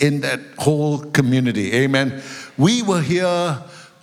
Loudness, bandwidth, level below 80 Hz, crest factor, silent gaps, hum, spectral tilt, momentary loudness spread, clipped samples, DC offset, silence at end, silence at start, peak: -19 LUFS; 15.5 kHz; -58 dBFS; 18 dB; none; none; -5.5 dB/octave; 7 LU; under 0.1%; under 0.1%; 0.15 s; 0 s; -2 dBFS